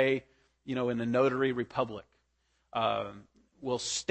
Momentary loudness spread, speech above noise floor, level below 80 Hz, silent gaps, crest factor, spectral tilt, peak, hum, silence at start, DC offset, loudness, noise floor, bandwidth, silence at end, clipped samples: 15 LU; 44 dB; -68 dBFS; none; 18 dB; -4.5 dB/octave; -14 dBFS; none; 0 s; under 0.1%; -32 LUFS; -75 dBFS; 8.8 kHz; 0.05 s; under 0.1%